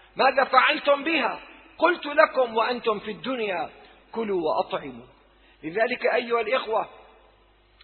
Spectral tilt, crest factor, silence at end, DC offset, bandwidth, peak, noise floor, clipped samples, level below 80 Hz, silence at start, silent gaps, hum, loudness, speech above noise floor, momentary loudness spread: -7 dB/octave; 22 dB; 0.85 s; under 0.1%; 4.5 kHz; -2 dBFS; -59 dBFS; under 0.1%; -64 dBFS; 0.15 s; none; none; -24 LUFS; 35 dB; 14 LU